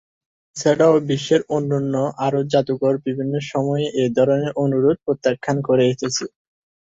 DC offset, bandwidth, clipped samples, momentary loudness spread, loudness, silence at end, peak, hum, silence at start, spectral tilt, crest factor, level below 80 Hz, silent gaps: under 0.1%; 8 kHz; under 0.1%; 7 LU; -19 LUFS; 0.6 s; -4 dBFS; none; 0.55 s; -6 dB/octave; 16 dB; -60 dBFS; none